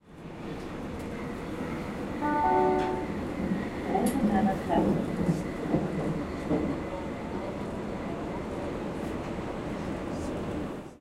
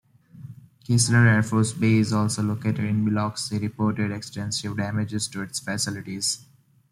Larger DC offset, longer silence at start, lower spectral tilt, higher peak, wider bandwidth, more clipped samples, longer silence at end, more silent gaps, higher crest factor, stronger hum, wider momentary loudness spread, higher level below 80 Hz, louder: neither; second, 0.05 s vs 0.35 s; first, -7 dB/octave vs -5 dB/octave; second, -14 dBFS vs -6 dBFS; first, 15 kHz vs 13 kHz; neither; second, 0 s vs 0.55 s; neither; about the same, 18 dB vs 18 dB; neither; about the same, 10 LU vs 12 LU; first, -48 dBFS vs -58 dBFS; second, -31 LUFS vs -24 LUFS